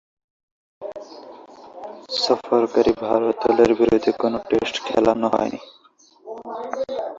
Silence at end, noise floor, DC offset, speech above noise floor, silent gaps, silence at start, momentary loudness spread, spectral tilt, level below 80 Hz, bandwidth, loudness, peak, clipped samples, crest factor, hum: 0 s; -54 dBFS; under 0.1%; 35 dB; none; 0.8 s; 21 LU; -5 dB/octave; -54 dBFS; 7.8 kHz; -20 LUFS; -2 dBFS; under 0.1%; 20 dB; none